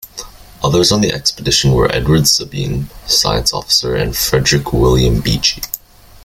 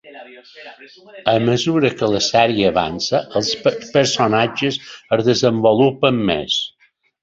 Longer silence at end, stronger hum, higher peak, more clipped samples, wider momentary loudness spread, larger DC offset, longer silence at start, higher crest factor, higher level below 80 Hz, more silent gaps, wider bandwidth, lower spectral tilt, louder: about the same, 0.45 s vs 0.55 s; neither; about the same, 0 dBFS vs 0 dBFS; neither; first, 11 LU vs 7 LU; neither; about the same, 0.05 s vs 0.05 s; about the same, 14 dB vs 18 dB; first, -26 dBFS vs -50 dBFS; neither; first, 17 kHz vs 8 kHz; about the same, -4 dB/octave vs -4.5 dB/octave; first, -13 LUFS vs -17 LUFS